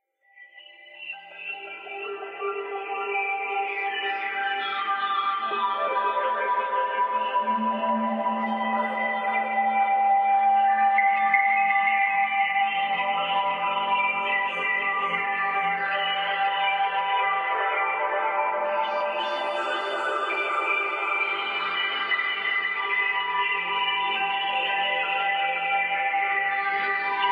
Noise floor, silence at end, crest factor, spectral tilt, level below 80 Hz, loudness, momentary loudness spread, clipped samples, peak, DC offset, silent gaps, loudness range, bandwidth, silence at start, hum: -53 dBFS; 0 s; 18 dB; -4 dB/octave; -90 dBFS; -24 LUFS; 6 LU; under 0.1%; -8 dBFS; under 0.1%; none; 5 LU; 8.2 kHz; 0.35 s; none